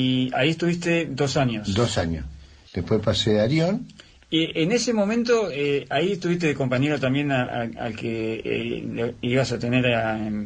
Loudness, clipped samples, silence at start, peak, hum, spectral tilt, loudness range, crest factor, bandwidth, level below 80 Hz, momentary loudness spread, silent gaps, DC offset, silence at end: -23 LUFS; under 0.1%; 0 s; -8 dBFS; none; -5.5 dB/octave; 2 LU; 16 dB; 9.8 kHz; -48 dBFS; 8 LU; none; under 0.1%; 0 s